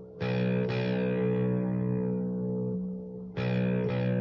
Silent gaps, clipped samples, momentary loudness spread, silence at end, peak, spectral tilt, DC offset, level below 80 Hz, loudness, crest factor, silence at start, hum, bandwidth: none; under 0.1%; 6 LU; 0 s; -18 dBFS; -10 dB/octave; under 0.1%; -60 dBFS; -30 LUFS; 12 dB; 0 s; none; 5.8 kHz